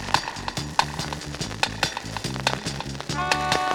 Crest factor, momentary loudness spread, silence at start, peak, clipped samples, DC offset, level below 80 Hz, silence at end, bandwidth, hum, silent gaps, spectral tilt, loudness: 24 dB; 8 LU; 0 s; -2 dBFS; under 0.1%; under 0.1%; -44 dBFS; 0 s; 19 kHz; none; none; -3 dB/octave; -26 LUFS